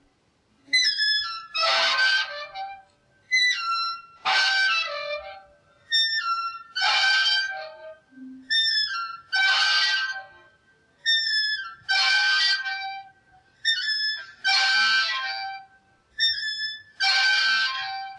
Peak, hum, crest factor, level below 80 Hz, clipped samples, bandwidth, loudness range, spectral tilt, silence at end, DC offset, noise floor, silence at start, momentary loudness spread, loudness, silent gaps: -10 dBFS; none; 16 dB; -72 dBFS; under 0.1%; 11.5 kHz; 2 LU; 2 dB/octave; 0 s; under 0.1%; -65 dBFS; 0.7 s; 14 LU; -22 LUFS; none